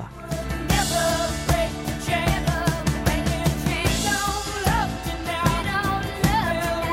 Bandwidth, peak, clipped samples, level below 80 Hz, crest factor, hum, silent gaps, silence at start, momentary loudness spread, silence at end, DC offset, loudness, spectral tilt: 16.5 kHz; -6 dBFS; under 0.1%; -32 dBFS; 18 dB; none; none; 0 s; 6 LU; 0 s; under 0.1%; -23 LUFS; -4.5 dB/octave